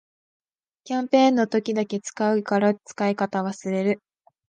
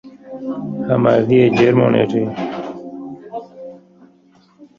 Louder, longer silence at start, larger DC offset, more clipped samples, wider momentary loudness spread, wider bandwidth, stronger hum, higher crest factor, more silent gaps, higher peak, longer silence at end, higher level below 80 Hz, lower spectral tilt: second, -23 LUFS vs -16 LUFS; first, 0.85 s vs 0.05 s; neither; neither; second, 10 LU vs 21 LU; first, 9.8 kHz vs 7.2 kHz; neither; about the same, 18 dB vs 16 dB; neither; second, -6 dBFS vs -2 dBFS; first, 0.5 s vs 0.15 s; second, -74 dBFS vs -54 dBFS; second, -5.5 dB/octave vs -8.5 dB/octave